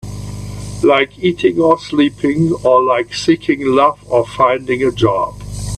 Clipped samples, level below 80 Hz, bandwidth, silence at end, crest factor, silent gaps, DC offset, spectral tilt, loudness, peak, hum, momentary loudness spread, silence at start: under 0.1%; -38 dBFS; 13 kHz; 0 s; 14 dB; none; under 0.1%; -6 dB/octave; -14 LUFS; 0 dBFS; 50 Hz at -40 dBFS; 13 LU; 0.05 s